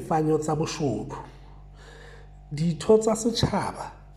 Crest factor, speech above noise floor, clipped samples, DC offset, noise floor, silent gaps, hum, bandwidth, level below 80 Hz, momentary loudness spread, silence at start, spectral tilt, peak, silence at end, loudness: 18 dB; 21 dB; under 0.1%; under 0.1%; -46 dBFS; none; 50 Hz at -50 dBFS; 13.5 kHz; -48 dBFS; 24 LU; 0 s; -5.5 dB/octave; -8 dBFS; 0 s; -25 LUFS